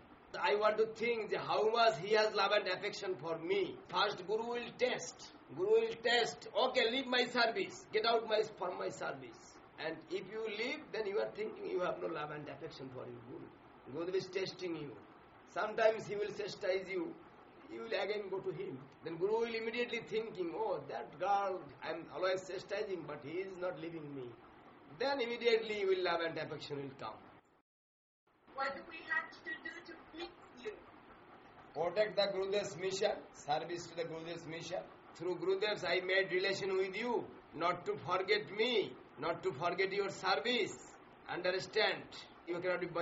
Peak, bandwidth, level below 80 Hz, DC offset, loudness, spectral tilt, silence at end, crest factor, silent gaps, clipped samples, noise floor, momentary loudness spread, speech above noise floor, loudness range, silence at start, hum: -18 dBFS; 7.6 kHz; -76 dBFS; under 0.1%; -37 LUFS; -1.5 dB/octave; 0 s; 20 dB; 27.61-28.27 s; under 0.1%; -59 dBFS; 16 LU; 21 dB; 8 LU; 0 s; none